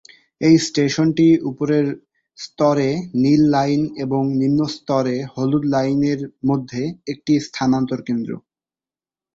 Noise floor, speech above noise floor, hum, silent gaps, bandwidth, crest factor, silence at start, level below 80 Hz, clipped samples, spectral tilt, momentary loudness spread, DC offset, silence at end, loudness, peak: under -90 dBFS; over 72 dB; none; none; 8 kHz; 16 dB; 0.4 s; -56 dBFS; under 0.1%; -6.5 dB/octave; 11 LU; under 0.1%; 0.95 s; -19 LUFS; -2 dBFS